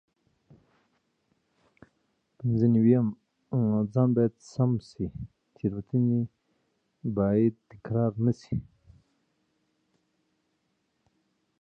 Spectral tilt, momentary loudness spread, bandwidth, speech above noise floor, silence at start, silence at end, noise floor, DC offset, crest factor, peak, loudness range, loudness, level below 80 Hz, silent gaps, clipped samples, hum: -10.5 dB/octave; 13 LU; 7.8 kHz; 50 dB; 2.4 s; 3 s; -76 dBFS; under 0.1%; 20 dB; -10 dBFS; 8 LU; -27 LUFS; -58 dBFS; none; under 0.1%; none